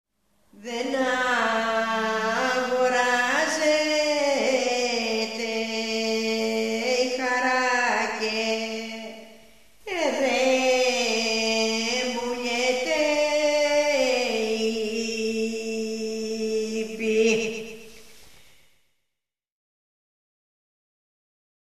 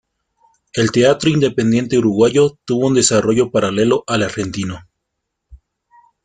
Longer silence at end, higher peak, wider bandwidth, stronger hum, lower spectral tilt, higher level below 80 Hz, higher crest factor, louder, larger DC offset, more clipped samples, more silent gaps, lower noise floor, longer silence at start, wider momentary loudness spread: first, 3.7 s vs 0.7 s; second, -10 dBFS vs -2 dBFS; first, 14 kHz vs 9.6 kHz; neither; second, -2 dB/octave vs -5 dB/octave; second, -64 dBFS vs -50 dBFS; about the same, 16 dB vs 16 dB; second, -24 LUFS vs -15 LUFS; first, 0.2% vs under 0.1%; neither; neither; first, -84 dBFS vs -76 dBFS; second, 0.55 s vs 0.75 s; about the same, 8 LU vs 10 LU